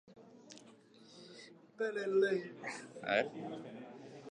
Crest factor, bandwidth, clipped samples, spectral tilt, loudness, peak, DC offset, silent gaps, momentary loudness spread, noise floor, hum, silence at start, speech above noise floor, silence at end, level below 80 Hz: 22 dB; 10.5 kHz; under 0.1%; -4.5 dB/octave; -37 LUFS; -18 dBFS; under 0.1%; none; 24 LU; -61 dBFS; none; 0.05 s; 24 dB; 0 s; -88 dBFS